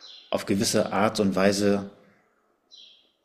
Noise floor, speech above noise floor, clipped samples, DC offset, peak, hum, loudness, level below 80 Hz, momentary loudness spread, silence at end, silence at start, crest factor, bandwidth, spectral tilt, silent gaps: -68 dBFS; 44 dB; under 0.1%; under 0.1%; -6 dBFS; none; -24 LUFS; -60 dBFS; 9 LU; 0.45 s; 0.05 s; 20 dB; 15 kHz; -4.5 dB/octave; none